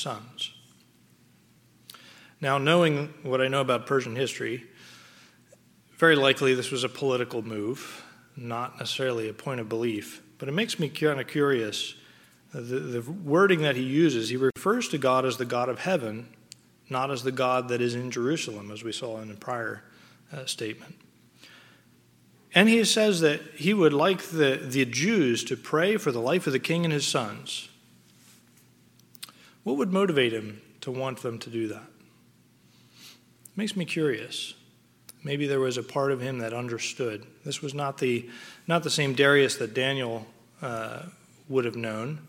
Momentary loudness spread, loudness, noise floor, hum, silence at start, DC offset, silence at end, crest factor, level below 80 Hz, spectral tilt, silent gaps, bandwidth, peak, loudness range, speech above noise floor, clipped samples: 16 LU; -27 LUFS; -60 dBFS; none; 0 s; under 0.1%; 0 s; 26 dB; -76 dBFS; -4.5 dB/octave; none; 17 kHz; -2 dBFS; 9 LU; 33 dB; under 0.1%